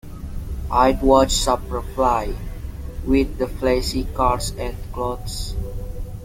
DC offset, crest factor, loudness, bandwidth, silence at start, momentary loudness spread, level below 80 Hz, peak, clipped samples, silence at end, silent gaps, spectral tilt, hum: under 0.1%; 18 dB; -21 LUFS; 17 kHz; 0.05 s; 17 LU; -28 dBFS; -2 dBFS; under 0.1%; 0 s; none; -5 dB/octave; none